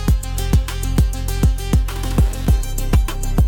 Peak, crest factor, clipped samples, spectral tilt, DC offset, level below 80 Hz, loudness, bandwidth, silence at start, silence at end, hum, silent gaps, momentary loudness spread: -2 dBFS; 14 dB; under 0.1%; -6 dB/octave; under 0.1%; -18 dBFS; -20 LUFS; 18.5 kHz; 0 s; 0 s; none; none; 3 LU